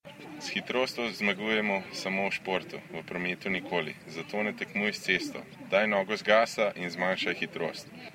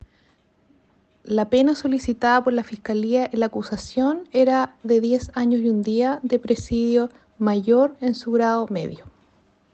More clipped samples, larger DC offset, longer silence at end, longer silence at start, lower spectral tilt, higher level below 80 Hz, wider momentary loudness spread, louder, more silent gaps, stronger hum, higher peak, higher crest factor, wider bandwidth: neither; neither; second, 0 s vs 0.65 s; second, 0.05 s vs 1.25 s; second, -4 dB/octave vs -6 dB/octave; second, -70 dBFS vs -52 dBFS; first, 12 LU vs 7 LU; second, -30 LUFS vs -21 LUFS; neither; neither; about the same, -8 dBFS vs -6 dBFS; first, 24 dB vs 16 dB; first, 16 kHz vs 8.4 kHz